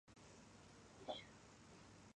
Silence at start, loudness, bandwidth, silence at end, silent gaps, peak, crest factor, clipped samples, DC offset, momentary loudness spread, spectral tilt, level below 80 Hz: 0.05 s; -58 LUFS; 10.5 kHz; 0.05 s; none; -34 dBFS; 26 dB; under 0.1%; under 0.1%; 11 LU; -4 dB/octave; -76 dBFS